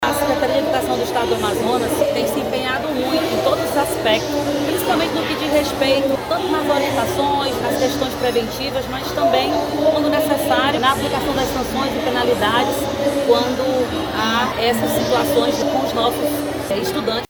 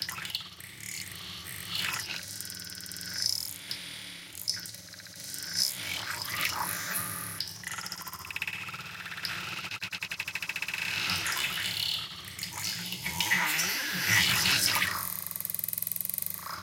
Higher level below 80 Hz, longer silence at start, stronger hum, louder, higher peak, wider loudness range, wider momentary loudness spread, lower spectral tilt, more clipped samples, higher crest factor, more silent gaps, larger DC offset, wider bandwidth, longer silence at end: first, -42 dBFS vs -64 dBFS; about the same, 0 s vs 0 s; neither; first, -18 LUFS vs -31 LUFS; first, -2 dBFS vs -8 dBFS; second, 1 LU vs 8 LU; second, 4 LU vs 13 LU; first, -4 dB/octave vs -0.5 dB/octave; neither; second, 16 dB vs 26 dB; neither; neither; first, over 20 kHz vs 17 kHz; about the same, 0.05 s vs 0 s